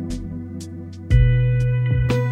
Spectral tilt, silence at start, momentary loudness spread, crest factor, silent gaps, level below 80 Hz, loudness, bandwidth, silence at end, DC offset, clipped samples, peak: -8 dB/octave; 0 s; 16 LU; 16 dB; none; -26 dBFS; -19 LUFS; 9.2 kHz; 0 s; under 0.1%; under 0.1%; -4 dBFS